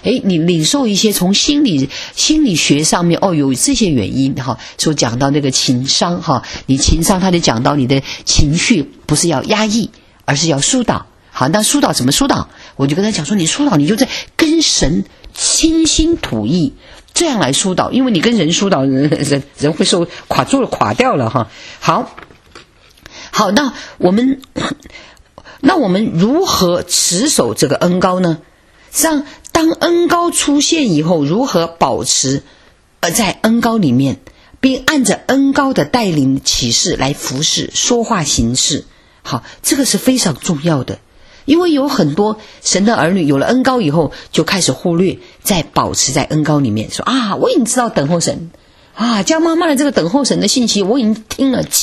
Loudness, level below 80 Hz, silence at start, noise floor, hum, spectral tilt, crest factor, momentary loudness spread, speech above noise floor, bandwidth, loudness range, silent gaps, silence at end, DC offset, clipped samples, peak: -13 LUFS; -32 dBFS; 0.05 s; -42 dBFS; none; -4 dB/octave; 14 dB; 7 LU; 29 dB; 14 kHz; 2 LU; none; 0 s; under 0.1%; under 0.1%; 0 dBFS